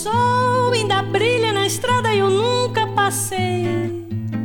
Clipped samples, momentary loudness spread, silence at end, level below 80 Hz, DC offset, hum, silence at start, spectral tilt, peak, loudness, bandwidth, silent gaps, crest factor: under 0.1%; 5 LU; 0 s; -52 dBFS; under 0.1%; none; 0 s; -4.5 dB/octave; -4 dBFS; -18 LUFS; 18.5 kHz; none; 14 dB